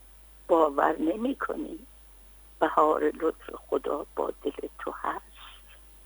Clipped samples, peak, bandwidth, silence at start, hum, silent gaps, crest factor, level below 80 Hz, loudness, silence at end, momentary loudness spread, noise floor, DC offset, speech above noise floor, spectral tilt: under 0.1%; -8 dBFS; over 20 kHz; 0.5 s; none; none; 22 dB; -54 dBFS; -28 LUFS; 0.3 s; 21 LU; -52 dBFS; under 0.1%; 24 dB; -5.5 dB/octave